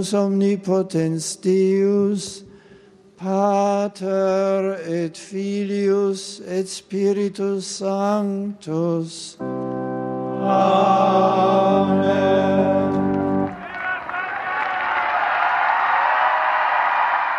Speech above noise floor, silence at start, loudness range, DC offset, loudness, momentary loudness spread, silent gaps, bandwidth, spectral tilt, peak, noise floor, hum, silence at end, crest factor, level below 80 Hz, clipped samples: 29 dB; 0 s; 6 LU; under 0.1%; -20 LUFS; 10 LU; none; 12 kHz; -5.5 dB/octave; -4 dBFS; -48 dBFS; none; 0 s; 16 dB; -62 dBFS; under 0.1%